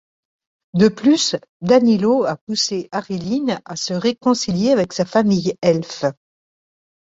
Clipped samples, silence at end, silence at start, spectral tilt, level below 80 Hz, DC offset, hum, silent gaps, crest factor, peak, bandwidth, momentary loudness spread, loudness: under 0.1%; 0.9 s; 0.75 s; -5 dB/octave; -56 dBFS; under 0.1%; none; 1.49-1.60 s, 2.41-2.47 s; 16 dB; -2 dBFS; 7.8 kHz; 10 LU; -18 LUFS